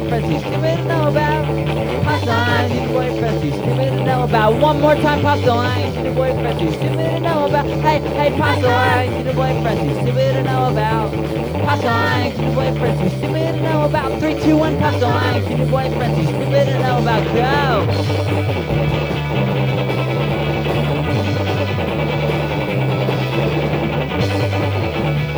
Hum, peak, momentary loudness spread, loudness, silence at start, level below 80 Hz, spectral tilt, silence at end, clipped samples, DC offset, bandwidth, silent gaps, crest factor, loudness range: none; 0 dBFS; 4 LU; -17 LUFS; 0 s; -34 dBFS; -7 dB/octave; 0 s; under 0.1%; under 0.1%; over 20 kHz; none; 16 dB; 3 LU